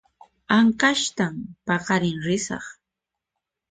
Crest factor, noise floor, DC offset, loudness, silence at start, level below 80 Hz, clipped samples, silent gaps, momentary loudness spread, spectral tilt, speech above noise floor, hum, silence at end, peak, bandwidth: 18 dB; -85 dBFS; under 0.1%; -22 LUFS; 0.5 s; -58 dBFS; under 0.1%; none; 14 LU; -4 dB/octave; 63 dB; none; 1 s; -6 dBFS; 9.4 kHz